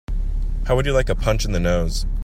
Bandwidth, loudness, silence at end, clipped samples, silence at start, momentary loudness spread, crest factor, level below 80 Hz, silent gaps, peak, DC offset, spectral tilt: 14.5 kHz; -22 LUFS; 0 s; under 0.1%; 0.1 s; 8 LU; 14 dB; -22 dBFS; none; -4 dBFS; under 0.1%; -5.5 dB/octave